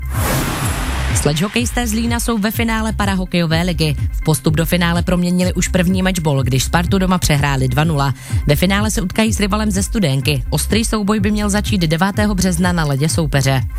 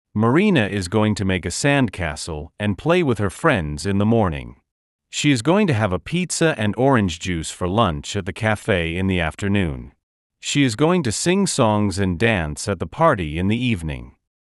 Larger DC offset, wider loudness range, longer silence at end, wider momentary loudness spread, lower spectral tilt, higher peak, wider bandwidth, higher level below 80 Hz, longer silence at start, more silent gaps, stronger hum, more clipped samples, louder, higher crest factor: neither; about the same, 2 LU vs 2 LU; second, 0 s vs 0.4 s; second, 3 LU vs 8 LU; about the same, -5 dB/octave vs -5.5 dB/octave; first, 0 dBFS vs -4 dBFS; first, 16.5 kHz vs 12 kHz; first, -26 dBFS vs -42 dBFS; second, 0 s vs 0.15 s; second, none vs 4.71-4.99 s, 10.03-10.30 s; neither; neither; first, -16 LUFS vs -20 LUFS; about the same, 14 dB vs 16 dB